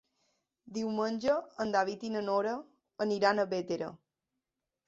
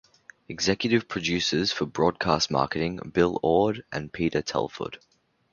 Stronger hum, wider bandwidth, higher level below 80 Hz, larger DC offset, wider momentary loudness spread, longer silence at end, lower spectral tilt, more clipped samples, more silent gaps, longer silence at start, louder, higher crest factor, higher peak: neither; about the same, 7.8 kHz vs 7.2 kHz; second, -74 dBFS vs -52 dBFS; neither; about the same, 9 LU vs 11 LU; first, 0.9 s vs 0.55 s; about the same, -5 dB/octave vs -4.5 dB/octave; neither; neither; first, 0.65 s vs 0.5 s; second, -33 LUFS vs -26 LUFS; about the same, 22 dB vs 22 dB; second, -12 dBFS vs -6 dBFS